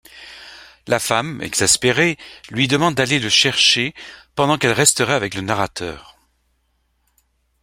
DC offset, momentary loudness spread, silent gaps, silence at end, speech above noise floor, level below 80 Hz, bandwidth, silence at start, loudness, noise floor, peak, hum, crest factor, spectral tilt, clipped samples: under 0.1%; 19 LU; none; 1.6 s; 48 dB; -52 dBFS; 16.5 kHz; 0.15 s; -16 LUFS; -66 dBFS; 0 dBFS; none; 20 dB; -2.5 dB/octave; under 0.1%